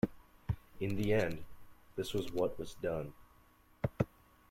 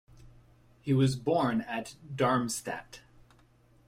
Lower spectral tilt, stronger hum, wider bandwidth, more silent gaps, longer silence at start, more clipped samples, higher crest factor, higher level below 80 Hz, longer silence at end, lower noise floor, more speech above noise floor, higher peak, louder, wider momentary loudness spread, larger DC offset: about the same, -6.5 dB/octave vs -6 dB/octave; neither; about the same, 16.5 kHz vs 16 kHz; neither; second, 0.05 s vs 0.2 s; neither; about the same, 22 dB vs 20 dB; first, -54 dBFS vs -62 dBFS; second, 0.45 s vs 0.9 s; about the same, -65 dBFS vs -62 dBFS; about the same, 30 dB vs 33 dB; about the same, -16 dBFS vs -14 dBFS; second, -38 LUFS vs -30 LUFS; second, 12 LU vs 16 LU; neither